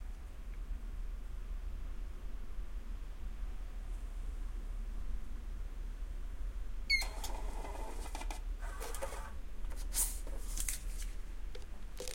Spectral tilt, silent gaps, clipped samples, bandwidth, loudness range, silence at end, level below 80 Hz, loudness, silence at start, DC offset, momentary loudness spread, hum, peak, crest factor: -2 dB/octave; none; under 0.1%; 16.5 kHz; 8 LU; 0 s; -42 dBFS; -43 LUFS; 0 s; under 0.1%; 14 LU; none; -18 dBFS; 20 dB